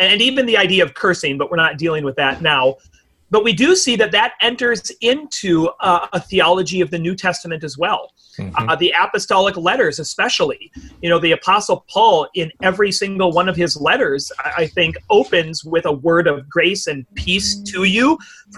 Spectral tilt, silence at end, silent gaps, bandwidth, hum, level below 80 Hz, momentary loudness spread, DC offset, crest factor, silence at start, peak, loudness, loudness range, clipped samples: -3.5 dB/octave; 0 s; none; 12.5 kHz; none; -46 dBFS; 7 LU; under 0.1%; 14 dB; 0 s; -2 dBFS; -16 LUFS; 2 LU; under 0.1%